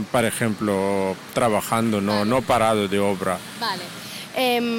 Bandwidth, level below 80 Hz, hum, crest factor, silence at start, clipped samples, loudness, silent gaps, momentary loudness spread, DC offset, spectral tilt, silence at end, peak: 17 kHz; -54 dBFS; none; 14 dB; 0 s; under 0.1%; -22 LUFS; none; 7 LU; under 0.1%; -4.5 dB/octave; 0 s; -8 dBFS